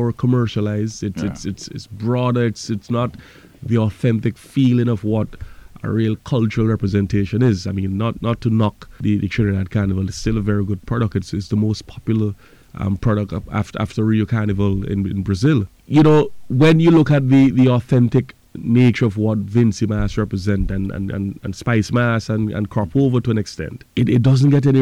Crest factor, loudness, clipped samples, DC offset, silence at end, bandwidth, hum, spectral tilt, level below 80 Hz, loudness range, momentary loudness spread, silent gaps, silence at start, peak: 12 dB; -18 LUFS; under 0.1%; under 0.1%; 0 s; 11 kHz; none; -7.5 dB/octave; -38 dBFS; 7 LU; 11 LU; none; 0 s; -6 dBFS